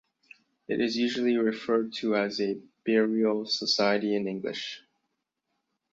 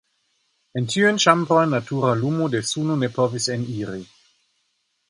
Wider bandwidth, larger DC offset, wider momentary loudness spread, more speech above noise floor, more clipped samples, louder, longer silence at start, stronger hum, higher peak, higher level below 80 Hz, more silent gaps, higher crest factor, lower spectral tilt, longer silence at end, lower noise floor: second, 7.8 kHz vs 11.5 kHz; neither; second, 10 LU vs 13 LU; first, 54 dB vs 50 dB; neither; second, -28 LUFS vs -21 LUFS; about the same, 0.7 s vs 0.75 s; neither; second, -10 dBFS vs 0 dBFS; second, -74 dBFS vs -62 dBFS; neither; about the same, 18 dB vs 22 dB; about the same, -4.5 dB/octave vs -4.5 dB/octave; about the same, 1.15 s vs 1.05 s; first, -81 dBFS vs -71 dBFS